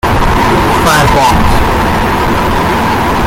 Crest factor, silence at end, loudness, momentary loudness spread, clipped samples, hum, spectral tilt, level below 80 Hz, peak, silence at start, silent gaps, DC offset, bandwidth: 8 dB; 0 s; -9 LUFS; 4 LU; under 0.1%; none; -5 dB/octave; -18 dBFS; 0 dBFS; 0.05 s; none; under 0.1%; 17 kHz